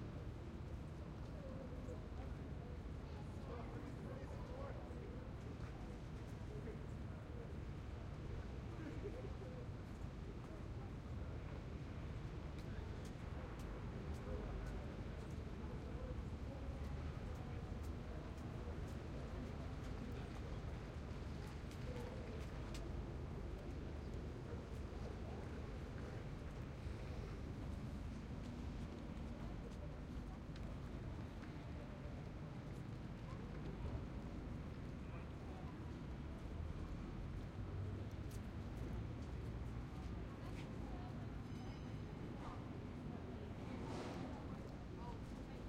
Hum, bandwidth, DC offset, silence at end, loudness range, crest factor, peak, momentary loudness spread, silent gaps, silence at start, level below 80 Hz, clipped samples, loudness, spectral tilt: none; 14.5 kHz; under 0.1%; 0 s; 2 LU; 14 dB; -34 dBFS; 3 LU; none; 0 s; -54 dBFS; under 0.1%; -50 LUFS; -7.5 dB/octave